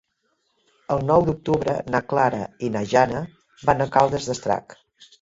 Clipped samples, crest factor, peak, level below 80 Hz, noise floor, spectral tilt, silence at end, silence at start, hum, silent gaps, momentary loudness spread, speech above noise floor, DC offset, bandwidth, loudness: under 0.1%; 20 dB; -2 dBFS; -50 dBFS; -71 dBFS; -6 dB/octave; 0.5 s; 0.9 s; none; none; 8 LU; 50 dB; under 0.1%; 8 kHz; -22 LUFS